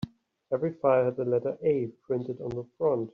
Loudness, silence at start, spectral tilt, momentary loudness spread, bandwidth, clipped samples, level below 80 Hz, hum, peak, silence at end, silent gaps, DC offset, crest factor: -29 LUFS; 0 s; -8 dB/octave; 11 LU; 5.8 kHz; under 0.1%; -64 dBFS; none; -10 dBFS; 0.05 s; none; under 0.1%; 18 dB